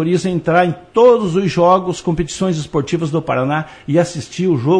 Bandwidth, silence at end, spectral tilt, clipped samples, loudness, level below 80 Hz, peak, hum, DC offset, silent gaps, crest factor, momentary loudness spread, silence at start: 10.5 kHz; 0 s; -6.5 dB/octave; under 0.1%; -16 LUFS; -42 dBFS; -2 dBFS; none; under 0.1%; none; 14 dB; 8 LU; 0 s